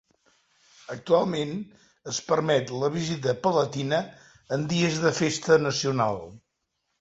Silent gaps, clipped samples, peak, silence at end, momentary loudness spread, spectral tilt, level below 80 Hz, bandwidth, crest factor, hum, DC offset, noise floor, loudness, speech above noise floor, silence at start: none; under 0.1%; -8 dBFS; 0.65 s; 16 LU; -5 dB/octave; -62 dBFS; 8 kHz; 20 dB; none; under 0.1%; -78 dBFS; -25 LUFS; 53 dB; 0.9 s